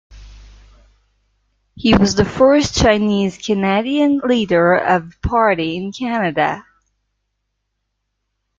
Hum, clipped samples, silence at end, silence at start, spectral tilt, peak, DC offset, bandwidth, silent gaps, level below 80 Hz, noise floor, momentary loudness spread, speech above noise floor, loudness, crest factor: 50 Hz at -50 dBFS; under 0.1%; 2 s; 0.1 s; -5 dB/octave; 0 dBFS; under 0.1%; 7.8 kHz; none; -38 dBFS; -73 dBFS; 7 LU; 58 dB; -16 LUFS; 16 dB